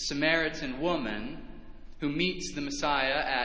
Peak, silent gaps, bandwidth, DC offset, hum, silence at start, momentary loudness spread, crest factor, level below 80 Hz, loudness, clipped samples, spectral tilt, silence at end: -10 dBFS; none; 8 kHz; under 0.1%; none; 0 s; 13 LU; 20 dB; -50 dBFS; -30 LUFS; under 0.1%; -3.5 dB/octave; 0 s